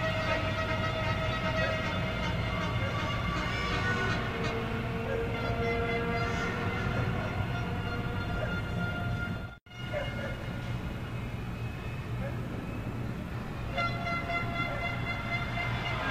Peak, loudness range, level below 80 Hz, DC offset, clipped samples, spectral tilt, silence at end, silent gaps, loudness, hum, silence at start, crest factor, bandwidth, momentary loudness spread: -16 dBFS; 6 LU; -42 dBFS; under 0.1%; under 0.1%; -6 dB/octave; 0 s; 9.61-9.66 s; -33 LUFS; none; 0 s; 16 dB; 15 kHz; 7 LU